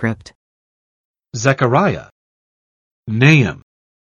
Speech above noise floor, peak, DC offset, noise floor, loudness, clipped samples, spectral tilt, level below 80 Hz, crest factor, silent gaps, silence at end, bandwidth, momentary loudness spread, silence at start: over 75 dB; 0 dBFS; under 0.1%; under -90 dBFS; -15 LUFS; under 0.1%; -6 dB/octave; -50 dBFS; 18 dB; 0.35-1.14 s, 2.11-3.03 s; 0.5 s; 7.4 kHz; 20 LU; 0 s